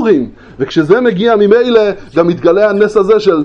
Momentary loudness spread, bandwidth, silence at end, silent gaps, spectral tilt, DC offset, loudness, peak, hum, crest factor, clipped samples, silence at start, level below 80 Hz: 6 LU; 7.8 kHz; 0 s; none; -7 dB/octave; under 0.1%; -10 LUFS; 0 dBFS; none; 10 dB; 0.3%; 0 s; -46 dBFS